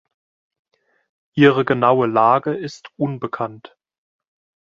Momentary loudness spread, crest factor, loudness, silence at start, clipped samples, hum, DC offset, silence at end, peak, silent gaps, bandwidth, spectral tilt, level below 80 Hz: 14 LU; 20 dB; -18 LUFS; 1.35 s; under 0.1%; none; under 0.1%; 1.1 s; 0 dBFS; none; 7.4 kHz; -7.5 dB/octave; -62 dBFS